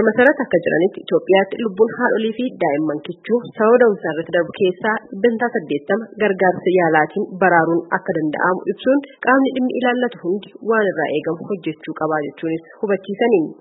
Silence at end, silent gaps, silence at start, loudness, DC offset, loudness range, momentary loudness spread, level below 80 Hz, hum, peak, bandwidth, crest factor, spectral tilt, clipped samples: 0.05 s; none; 0 s; -18 LUFS; under 0.1%; 3 LU; 9 LU; -68 dBFS; none; 0 dBFS; 4 kHz; 18 dB; -9.5 dB/octave; under 0.1%